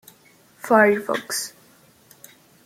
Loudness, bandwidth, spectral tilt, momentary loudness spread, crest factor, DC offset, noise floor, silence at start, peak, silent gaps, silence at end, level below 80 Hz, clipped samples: -20 LUFS; 16.5 kHz; -3.5 dB/octave; 17 LU; 22 dB; under 0.1%; -54 dBFS; 0.65 s; -2 dBFS; none; 1.15 s; -70 dBFS; under 0.1%